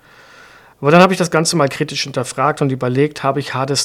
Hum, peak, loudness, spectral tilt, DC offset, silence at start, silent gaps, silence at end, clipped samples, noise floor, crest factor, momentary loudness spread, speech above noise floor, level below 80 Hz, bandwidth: none; 0 dBFS; -15 LUFS; -4.5 dB/octave; under 0.1%; 0.8 s; none; 0 s; 0.2%; -43 dBFS; 16 dB; 10 LU; 28 dB; -56 dBFS; 16 kHz